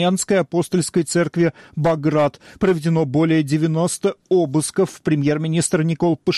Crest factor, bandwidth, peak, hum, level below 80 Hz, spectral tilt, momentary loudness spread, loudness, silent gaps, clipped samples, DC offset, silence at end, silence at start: 10 dB; 12.5 kHz; -8 dBFS; none; -54 dBFS; -5.5 dB/octave; 4 LU; -19 LUFS; none; under 0.1%; under 0.1%; 0 s; 0 s